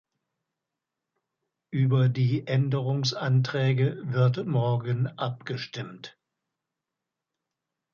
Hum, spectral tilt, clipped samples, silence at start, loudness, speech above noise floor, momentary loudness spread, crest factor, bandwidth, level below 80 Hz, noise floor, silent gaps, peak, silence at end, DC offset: none; -7 dB/octave; under 0.1%; 1.7 s; -26 LUFS; 61 dB; 12 LU; 16 dB; 7 kHz; -68 dBFS; -87 dBFS; none; -12 dBFS; 1.85 s; under 0.1%